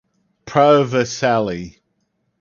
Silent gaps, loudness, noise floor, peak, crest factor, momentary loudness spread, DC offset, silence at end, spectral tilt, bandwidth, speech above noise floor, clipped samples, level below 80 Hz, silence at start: none; -16 LUFS; -69 dBFS; 0 dBFS; 18 dB; 15 LU; under 0.1%; 0.7 s; -5.5 dB/octave; 7.2 kHz; 53 dB; under 0.1%; -52 dBFS; 0.45 s